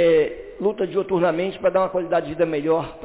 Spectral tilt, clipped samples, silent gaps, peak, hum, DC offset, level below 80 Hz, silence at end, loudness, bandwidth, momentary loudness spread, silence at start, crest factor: -10.5 dB/octave; under 0.1%; none; -10 dBFS; none; under 0.1%; -52 dBFS; 0 s; -22 LUFS; 4 kHz; 5 LU; 0 s; 12 dB